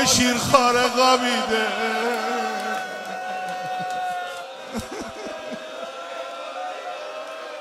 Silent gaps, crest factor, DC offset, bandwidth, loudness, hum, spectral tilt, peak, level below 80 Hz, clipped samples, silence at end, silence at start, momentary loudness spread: none; 22 dB; under 0.1%; 16 kHz; -23 LUFS; none; -2.5 dB/octave; -2 dBFS; -56 dBFS; under 0.1%; 0 s; 0 s; 16 LU